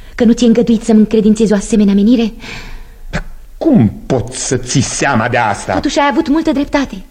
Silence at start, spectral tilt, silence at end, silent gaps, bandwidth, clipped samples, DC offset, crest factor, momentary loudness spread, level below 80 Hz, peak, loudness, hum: 0 s; -5.5 dB/octave; 0.05 s; none; 11 kHz; under 0.1%; under 0.1%; 12 dB; 13 LU; -30 dBFS; 0 dBFS; -12 LUFS; none